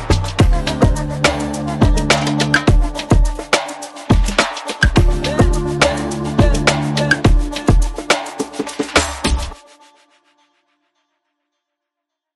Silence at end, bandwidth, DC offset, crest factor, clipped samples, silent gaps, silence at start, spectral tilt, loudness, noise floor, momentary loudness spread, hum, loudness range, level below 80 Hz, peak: 2.8 s; 12 kHz; under 0.1%; 16 dB; under 0.1%; none; 0 s; -5 dB/octave; -16 LUFS; -81 dBFS; 7 LU; none; 7 LU; -20 dBFS; 0 dBFS